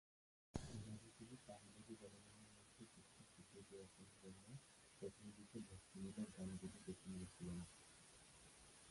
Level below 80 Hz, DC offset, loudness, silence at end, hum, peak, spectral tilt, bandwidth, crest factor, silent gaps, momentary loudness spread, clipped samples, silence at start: -72 dBFS; under 0.1%; -58 LUFS; 0 s; none; -30 dBFS; -5.5 dB/octave; 11.5 kHz; 28 dB; none; 11 LU; under 0.1%; 0.55 s